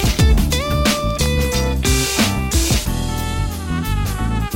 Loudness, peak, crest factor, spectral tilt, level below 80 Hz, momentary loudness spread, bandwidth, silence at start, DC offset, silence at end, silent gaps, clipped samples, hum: -18 LUFS; -4 dBFS; 12 dB; -4.5 dB/octave; -20 dBFS; 7 LU; 17 kHz; 0 s; under 0.1%; 0 s; none; under 0.1%; none